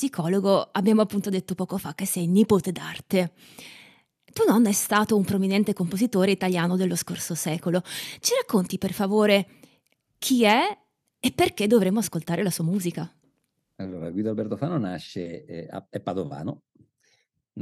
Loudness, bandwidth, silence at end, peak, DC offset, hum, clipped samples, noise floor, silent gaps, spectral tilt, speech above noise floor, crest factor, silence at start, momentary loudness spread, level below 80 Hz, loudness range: -24 LUFS; 15 kHz; 0 s; -6 dBFS; under 0.1%; none; under 0.1%; -74 dBFS; none; -5 dB/octave; 50 dB; 18 dB; 0 s; 16 LU; -62 dBFS; 8 LU